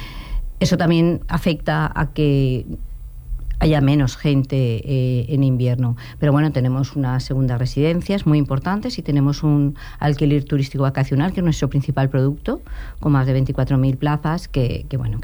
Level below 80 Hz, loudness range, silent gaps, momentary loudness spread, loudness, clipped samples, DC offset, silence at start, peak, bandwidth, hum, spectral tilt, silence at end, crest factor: -32 dBFS; 1 LU; none; 8 LU; -19 LUFS; under 0.1%; under 0.1%; 0 s; -6 dBFS; over 20 kHz; none; -7.5 dB/octave; 0 s; 14 dB